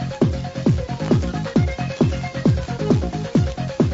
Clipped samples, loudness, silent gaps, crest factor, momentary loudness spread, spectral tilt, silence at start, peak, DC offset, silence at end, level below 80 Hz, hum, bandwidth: under 0.1%; -21 LUFS; none; 16 dB; 2 LU; -7.5 dB/octave; 0 s; -4 dBFS; under 0.1%; 0 s; -32 dBFS; none; 8 kHz